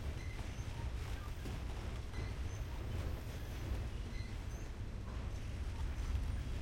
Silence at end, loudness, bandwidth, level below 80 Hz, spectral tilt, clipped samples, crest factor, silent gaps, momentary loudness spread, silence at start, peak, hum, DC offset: 0 s; -45 LUFS; 16.5 kHz; -44 dBFS; -6 dB/octave; under 0.1%; 14 dB; none; 4 LU; 0 s; -28 dBFS; none; under 0.1%